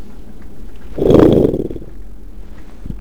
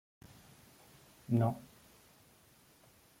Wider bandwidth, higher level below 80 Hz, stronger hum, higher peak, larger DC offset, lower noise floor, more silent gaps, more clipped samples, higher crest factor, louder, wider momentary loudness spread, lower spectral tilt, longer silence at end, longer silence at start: first, over 20 kHz vs 16.5 kHz; first, -30 dBFS vs -72 dBFS; neither; first, 0 dBFS vs -18 dBFS; first, 5% vs under 0.1%; second, -34 dBFS vs -65 dBFS; neither; neither; second, 16 dB vs 22 dB; first, -12 LUFS vs -35 LUFS; second, 22 LU vs 27 LU; about the same, -9 dB/octave vs -8.5 dB/octave; second, 0 s vs 1.55 s; second, 0 s vs 1.3 s